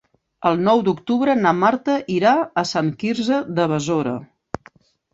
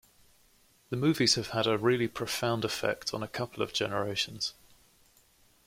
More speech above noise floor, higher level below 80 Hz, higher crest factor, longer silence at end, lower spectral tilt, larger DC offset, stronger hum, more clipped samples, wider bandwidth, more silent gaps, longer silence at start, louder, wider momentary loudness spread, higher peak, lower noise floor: about the same, 33 dB vs 34 dB; first, -58 dBFS vs -64 dBFS; about the same, 16 dB vs 20 dB; second, 0.9 s vs 1.15 s; first, -6 dB/octave vs -4 dB/octave; neither; neither; neither; second, 8 kHz vs 16.5 kHz; neither; second, 0.4 s vs 0.9 s; first, -19 LUFS vs -30 LUFS; first, 13 LU vs 10 LU; first, -2 dBFS vs -12 dBFS; second, -52 dBFS vs -64 dBFS